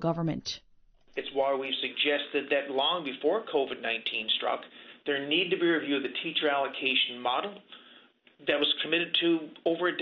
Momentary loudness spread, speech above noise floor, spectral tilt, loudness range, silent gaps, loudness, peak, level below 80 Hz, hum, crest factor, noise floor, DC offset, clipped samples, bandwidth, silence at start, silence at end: 10 LU; 29 dB; -5 dB/octave; 1 LU; none; -29 LUFS; -12 dBFS; -70 dBFS; none; 18 dB; -58 dBFS; under 0.1%; under 0.1%; 6.6 kHz; 0 s; 0 s